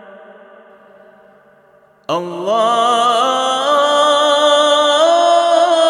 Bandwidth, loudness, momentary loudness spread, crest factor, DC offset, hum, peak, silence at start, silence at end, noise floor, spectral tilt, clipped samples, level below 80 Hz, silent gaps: 13 kHz; -13 LUFS; 9 LU; 14 dB; under 0.1%; none; 0 dBFS; 2.1 s; 0 s; -50 dBFS; -2 dB/octave; under 0.1%; -76 dBFS; none